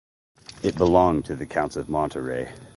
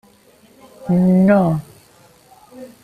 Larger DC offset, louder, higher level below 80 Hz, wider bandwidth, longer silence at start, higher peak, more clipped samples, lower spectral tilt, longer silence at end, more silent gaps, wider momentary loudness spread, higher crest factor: neither; second, -24 LUFS vs -15 LUFS; first, -44 dBFS vs -52 dBFS; first, 11.5 kHz vs 9.6 kHz; second, 0.5 s vs 0.8 s; about the same, -4 dBFS vs -4 dBFS; neither; second, -7 dB/octave vs -9.5 dB/octave; about the same, 0.1 s vs 0.15 s; neither; about the same, 11 LU vs 13 LU; about the same, 20 dB vs 16 dB